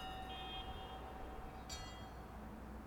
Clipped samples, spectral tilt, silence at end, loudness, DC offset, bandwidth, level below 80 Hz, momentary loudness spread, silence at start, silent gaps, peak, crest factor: under 0.1%; -4 dB/octave; 0 s; -50 LUFS; under 0.1%; over 20 kHz; -54 dBFS; 6 LU; 0 s; none; -34 dBFS; 16 dB